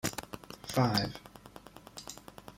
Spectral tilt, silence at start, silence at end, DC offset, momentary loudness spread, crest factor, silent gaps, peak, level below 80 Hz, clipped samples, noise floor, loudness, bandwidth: -4.5 dB/octave; 0.05 s; 0 s; under 0.1%; 23 LU; 24 dB; none; -14 dBFS; -60 dBFS; under 0.1%; -53 dBFS; -34 LUFS; 16.5 kHz